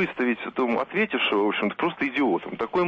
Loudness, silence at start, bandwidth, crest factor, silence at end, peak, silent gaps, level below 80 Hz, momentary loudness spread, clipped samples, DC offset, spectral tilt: -25 LUFS; 0 s; 7 kHz; 12 dB; 0 s; -14 dBFS; none; -64 dBFS; 4 LU; under 0.1%; under 0.1%; -7 dB/octave